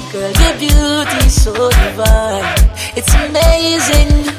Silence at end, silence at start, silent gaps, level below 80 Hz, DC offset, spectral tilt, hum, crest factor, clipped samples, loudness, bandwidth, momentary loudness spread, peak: 0 s; 0 s; none; -12 dBFS; under 0.1%; -4 dB/octave; none; 10 dB; under 0.1%; -12 LUFS; 16 kHz; 3 LU; 0 dBFS